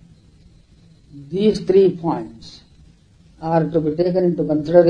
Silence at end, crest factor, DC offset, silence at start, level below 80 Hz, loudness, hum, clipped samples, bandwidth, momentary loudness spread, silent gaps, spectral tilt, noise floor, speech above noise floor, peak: 0 s; 18 dB; under 0.1%; 1.15 s; -50 dBFS; -19 LUFS; none; under 0.1%; 9.6 kHz; 14 LU; none; -8.5 dB/octave; -50 dBFS; 33 dB; 0 dBFS